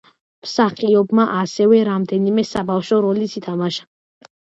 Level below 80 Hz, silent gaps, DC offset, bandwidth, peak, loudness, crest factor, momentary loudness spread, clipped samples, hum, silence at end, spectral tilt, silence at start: -58 dBFS; none; under 0.1%; 8 kHz; -2 dBFS; -17 LUFS; 16 dB; 9 LU; under 0.1%; none; 0.7 s; -6.5 dB/octave; 0.45 s